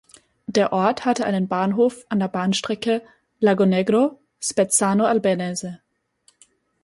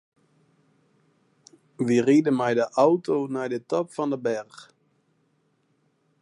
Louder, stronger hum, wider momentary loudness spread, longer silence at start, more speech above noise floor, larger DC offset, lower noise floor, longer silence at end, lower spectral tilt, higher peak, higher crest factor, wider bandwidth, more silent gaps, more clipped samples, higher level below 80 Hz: first, -21 LUFS vs -24 LUFS; neither; about the same, 8 LU vs 10 LU; second, 0.5 s vs 1.8 s; second, 42 dB vs 46 dB; neither; second, -62 dBFS vs -69 dBFS; second, 1.1 s vs 1.6 s; second, -4.5 dB/octave vs -6.5 dB/octave; about the same, -4 dBFS vs -6 dBFS; about the same, 18 dB vs 20 dB; about the same, 11.5 kHz vs 11 kHz; neither; neither; first, -64 dBFS vs -78 dBFS